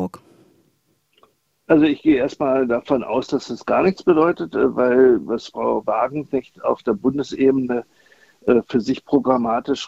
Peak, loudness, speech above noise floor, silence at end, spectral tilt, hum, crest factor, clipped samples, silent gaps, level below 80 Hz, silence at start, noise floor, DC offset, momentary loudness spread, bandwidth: -2 dBFS; -19 LUFS; 46 dB; 0 s; -6.5 dB/octave; none; 18 dB; under 0.1%; none; -54 dBFS; 0 s; -65 dBFS; under 0.1%; 9 LU; 7.8 kHz